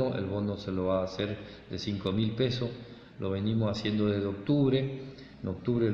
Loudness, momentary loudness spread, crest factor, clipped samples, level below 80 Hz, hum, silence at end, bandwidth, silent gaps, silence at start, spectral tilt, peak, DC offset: -31 LUFS; 13 LU; 16 dB; under 0.1%; -58 dBFS; none; 0 s; 7.4 kHz; none; 0 s; -7.5 dB/octave; -14 dBFS; under 0.1%